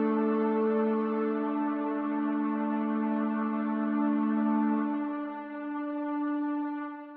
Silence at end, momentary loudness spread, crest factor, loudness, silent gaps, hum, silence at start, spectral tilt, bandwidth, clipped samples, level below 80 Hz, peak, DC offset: 0 s; 7 LU; 12 dB; -30 LUFS; none; none; 0 s; -7 dB/octave; 4.2 kHz; under 0.1%; -84 dBFS; -18 dBFS; under 0.1%